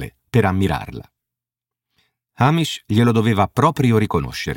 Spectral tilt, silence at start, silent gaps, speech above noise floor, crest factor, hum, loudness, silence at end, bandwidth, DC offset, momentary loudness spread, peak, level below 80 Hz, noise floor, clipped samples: -6.5 dB/octave; 0 s; none; 71 dB; 18 dB; none; -18 LUFS; 0 s; 17 kHz; under 0.1%; 7 LU; -2 dBFS; -42 dBFS; -88 dBFS; under 0.1%